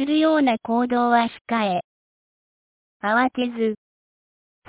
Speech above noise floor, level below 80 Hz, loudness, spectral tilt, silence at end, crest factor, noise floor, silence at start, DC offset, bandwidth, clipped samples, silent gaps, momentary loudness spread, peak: over 70 dB; -66 dBFS; -21 LUFS; -9 dB/octave; 0.95 s; 16 dB; under -90 dBFS; 0 s; under 0.1%; 4 kHz; under 0.1%; 1.41-1.45 s, 1.84-3.00 s; 8 LU; -6 dBFS